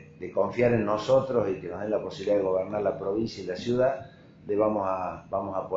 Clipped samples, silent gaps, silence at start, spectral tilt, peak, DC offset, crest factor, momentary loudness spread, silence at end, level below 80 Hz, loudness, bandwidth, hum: under 0.1%; none; 0 s; -7 dB/octave; -10 dBFS; under 0.1%; 16 dB; 9 LU; 0 s; -58 dBFS; -28 LUFS; 7.8 kHz; none